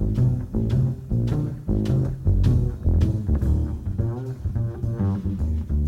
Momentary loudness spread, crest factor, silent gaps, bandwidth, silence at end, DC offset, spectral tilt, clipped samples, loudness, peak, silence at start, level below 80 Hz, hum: 6 LU; 14 dB; none; 7.6 kHz; 0 s; under 0.1%; -10 dB/octave; under 0.1%; -24 LUFS; -8 dBFS; 0 s; -28 dBFS; none